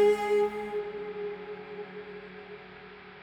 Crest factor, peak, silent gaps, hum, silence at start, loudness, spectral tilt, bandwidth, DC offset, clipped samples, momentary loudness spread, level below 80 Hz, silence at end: 18 dB; -14 dBFS; none; none; 0 s; -32 LUFS; -5 dB/octave; 12 kHz; under 0.1%; under 0.1%; 19 LU; -66 dBFS; 0 s